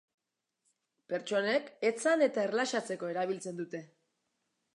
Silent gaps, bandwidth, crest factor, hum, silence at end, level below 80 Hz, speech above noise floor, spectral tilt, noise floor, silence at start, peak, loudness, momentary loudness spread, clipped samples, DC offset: none; 11.5 kHz; 18 dB; none; 0.9 s; -90 dBFS; 50 dB; -4 dB/octave; -82 dBFS; 1.1 s; -16 dBFS; -32 LUFS; 12 LU; under 0.1%; under 0.1%